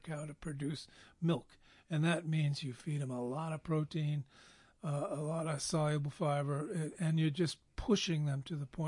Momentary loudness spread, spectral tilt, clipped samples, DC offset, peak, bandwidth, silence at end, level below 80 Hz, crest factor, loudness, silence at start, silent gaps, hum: 9 LU; -6 dB/octave; under 0.1%; under 0.1%; -20 dBFS; 11.5 kHz; 0 s; -60 dBFS; 18 dB; -37 LUFS; 0.05 s; none; none